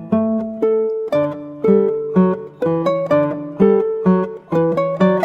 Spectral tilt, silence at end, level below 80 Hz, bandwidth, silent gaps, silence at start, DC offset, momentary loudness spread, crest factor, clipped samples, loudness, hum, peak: -9.5 dB/octave; 0 s; -56 dBFS; 7 kHz; none; 0 s; under 0.1%; 6 LU; 16 dB; under 0.1%; -17 LUFS; none; 0 dBFS